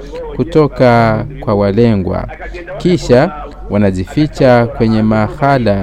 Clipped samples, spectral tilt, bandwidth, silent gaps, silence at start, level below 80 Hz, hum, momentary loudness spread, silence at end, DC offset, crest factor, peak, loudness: under 0.1%; -8 dB/octave; 11 kHz; none; 0 s; -30 dBFS; none; 11 LU; 0 s; under 0.1%; 12 dB; 0 dBFS; -12 LUFS